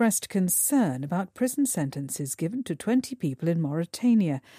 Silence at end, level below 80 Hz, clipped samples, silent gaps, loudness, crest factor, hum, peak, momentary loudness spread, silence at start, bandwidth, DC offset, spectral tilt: 0.2 s; -70 dBFS; under 0.1%; none; -26 LUFS; 14 dB; none; -12 dBFS; 8 LU; 0 s; 15.5 kHz; under 0.1%; -5 dB/octave